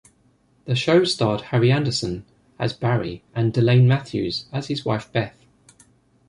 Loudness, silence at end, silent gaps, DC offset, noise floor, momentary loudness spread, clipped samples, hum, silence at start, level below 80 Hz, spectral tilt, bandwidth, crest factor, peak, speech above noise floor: -21 LUFS; 1 s; none; under 0.1%; -60 dBFS; 11 LU; under 0.1%; none; 0.65 s; -52 dBFS; -6.5 dB/octave; 11 kHz; 18 dB; -4 dBFS; 40 dB